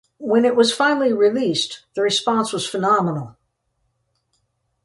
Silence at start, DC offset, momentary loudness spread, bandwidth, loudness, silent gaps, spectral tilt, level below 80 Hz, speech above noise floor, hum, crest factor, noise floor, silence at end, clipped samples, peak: 0.2 s; under 0.1%; 8 LU; 11.5 kHz; -19 LUFS; none; -4 dB/octave; -66 dBFS; 52 dB; none; 16 dB; -71 dBFS; 1.55 s; under 0.1%; -4 dBFS